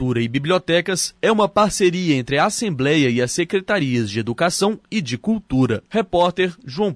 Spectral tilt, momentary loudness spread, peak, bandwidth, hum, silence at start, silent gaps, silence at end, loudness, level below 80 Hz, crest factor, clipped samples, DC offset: -4.5 dB/octave; 6 LU; -6 dBFS; 11 kHz; none; 0 s; none; 0 s; -19 LUFS; -48 dBFS; 14 dB; under 0.1%; under 0.1%